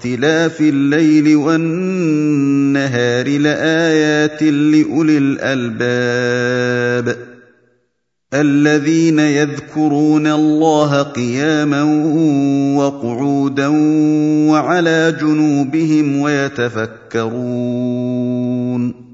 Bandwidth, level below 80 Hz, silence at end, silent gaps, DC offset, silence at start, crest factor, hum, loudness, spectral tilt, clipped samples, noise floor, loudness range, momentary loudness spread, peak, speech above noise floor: 7.8 kHz; -60 dBFS; 0.1 s; none; under 0.1%; 0 s; 14 dB; none; -14 LUFS; -6 dB/octave; under 0.1%; -69 dBFS; 3 LU; 6 LU; 0 dBFS; 55 dB